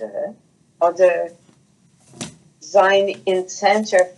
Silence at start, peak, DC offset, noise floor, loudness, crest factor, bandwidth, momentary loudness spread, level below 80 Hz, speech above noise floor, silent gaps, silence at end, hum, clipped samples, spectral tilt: 0 s; -2 dBFS; under 0.1%; -56 dBFS; -18 LUFS; 18 dB; 11.5 kHz; 19 LU; -72 dBFS; 39 dB; none; 0.05 s; none; under 0.1%; -3.5 dB/octave